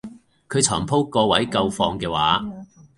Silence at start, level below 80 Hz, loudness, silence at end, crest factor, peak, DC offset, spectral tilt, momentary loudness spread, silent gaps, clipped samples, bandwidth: 0.05 s; -48 dBFS; -20 LUFS; 0.35 s; 20 dB; -2 dBFS; under 0.1%; -3.5 dB/octave; 7 LU; none; under 0.1%; 11.5 kHz